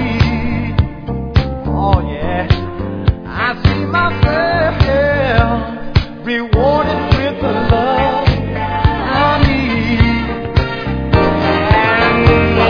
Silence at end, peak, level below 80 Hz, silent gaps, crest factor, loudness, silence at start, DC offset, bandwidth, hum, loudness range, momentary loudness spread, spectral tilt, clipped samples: 0 s; 0 dBFS; -22 dBFS; none; 14 dB; -14 LUFS; 0 s; under 0.1%; 5.4 kHz; none; 3 LU; 7 LU; -8 dB/octave; under 0.1%